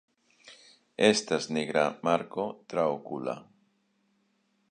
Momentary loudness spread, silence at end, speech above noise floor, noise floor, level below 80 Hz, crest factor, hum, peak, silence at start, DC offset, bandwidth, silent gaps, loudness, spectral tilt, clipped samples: 12 LU; 1.25 s; 44 dB; -72 dBFS; -72 dBFS; 24 dB; none; -6 dBFS; 0.45 s; under 0.1%; 10 kHz; none; -29 LUFS; -4 dB/octave; under 0.1%